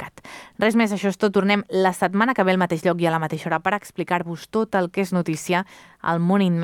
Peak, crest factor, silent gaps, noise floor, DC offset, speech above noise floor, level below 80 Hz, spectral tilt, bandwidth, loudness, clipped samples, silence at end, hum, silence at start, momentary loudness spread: -4 dBFS; 16 dB; none; -42 dBFS; under 0.1%; 21 dB; -64 dBFS; -6 dB/octave; 16.5 kHz; -22 LUFS; under 0.1%; 0 s; none; 0 s; 7 LU